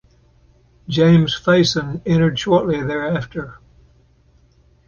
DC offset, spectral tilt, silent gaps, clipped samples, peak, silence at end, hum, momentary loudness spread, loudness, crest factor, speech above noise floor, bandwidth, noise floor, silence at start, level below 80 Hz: under 0.1%; -6.5 dB/octave; none; under 0.1%; -2 dBFS; 1.3 s; none; 12 LU; -17 LUFS; 16 dB; 38 dB; 7.2 kHz; -54 dBFS; 0.9 s; -46 dBFS